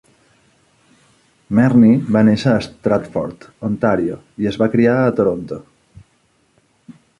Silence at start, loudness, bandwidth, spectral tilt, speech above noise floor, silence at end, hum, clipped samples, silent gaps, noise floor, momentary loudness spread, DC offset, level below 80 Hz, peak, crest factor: 1.5 s; -16 LUFS; 9.4 kHz; -8 dB/octave; 44 dB; 1.6 s; none; under 0.1%; none; -60 dBFS; 14 LU; under 0.1%; -50 dBFS; -2 dBFS; 16 dB